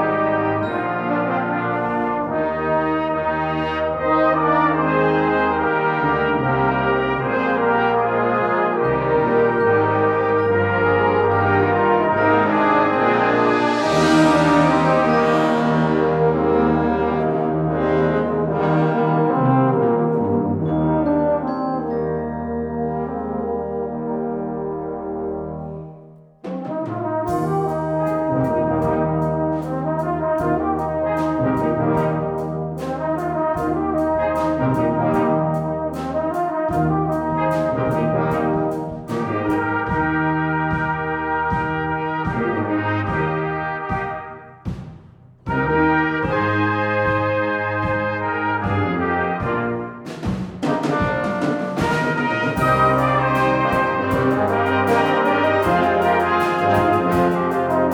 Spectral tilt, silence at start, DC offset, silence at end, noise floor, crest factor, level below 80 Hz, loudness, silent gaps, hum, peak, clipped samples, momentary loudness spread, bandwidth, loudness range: -7.5 dB/octave; 0 s; under 0.1%; 0 s; -45 dBFS; 16 dB; -42 dBFS; -19 LUFS; none; none; -4 dBFS; under 0.1%; 8 LU; 18 kHz; 7 LU